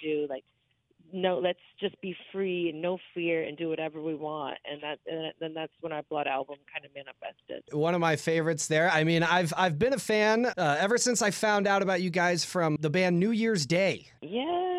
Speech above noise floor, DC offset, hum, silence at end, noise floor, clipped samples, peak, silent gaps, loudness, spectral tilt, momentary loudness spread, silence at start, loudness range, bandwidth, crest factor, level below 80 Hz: 37 dB; under 0.1%; none; 0 s; -66 dBFS; under 0.1%; -10 dBFS; none; -28 LUFS; -4.5 dB/octave; 13 LU; 0 s; 9 LU; 14.5 kHz; 18 dB; -68 dBFS